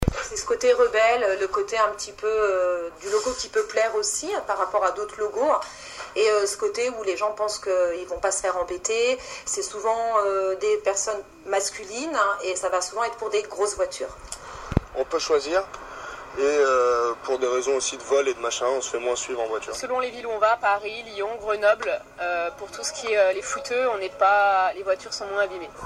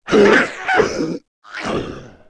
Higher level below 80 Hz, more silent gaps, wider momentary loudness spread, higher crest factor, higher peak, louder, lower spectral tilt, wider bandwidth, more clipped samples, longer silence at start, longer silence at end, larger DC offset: about the same, -46 dBFS vs -46 dBFS; second, none vs 1.28-1.42 s; second, 9 LU vs 20 LU; first, 22 dB vs 16 dB; about the same, -2 dBFS vs -2 dBFS; second, -24 LUFS vs -16 LUFS; second, -2.5 dB/octave vs -4.5 dB/octave; first, 14 kHz vs 11 kHz; neither; about the same, 0 s vs 0.05 s; second, 0 s vs 0.2 s; neither